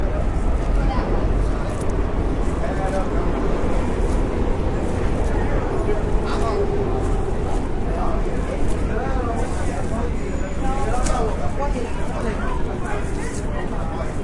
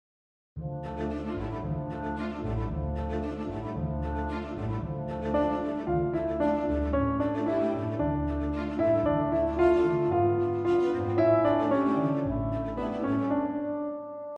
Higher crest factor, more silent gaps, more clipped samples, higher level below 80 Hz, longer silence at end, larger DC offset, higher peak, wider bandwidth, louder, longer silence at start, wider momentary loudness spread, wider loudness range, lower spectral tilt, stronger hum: about the same, 14 dB vs 16 dB; neither; neither; first, -24 dBFS vs -42 dBFS; about the same, 0 s vs 0 s; neither; first, -6 dBFS vs -12 dBFS; first, 11.5 kHz vs 7 kHz; first, -24 LUFS vs -29 LUFS; second, 0 s vs 0.55 s; second, 4 LU vs 9 LU; second, 2 LU vs 8 LU; second, -7 dB/octave vs -9.5 dB/octave; neither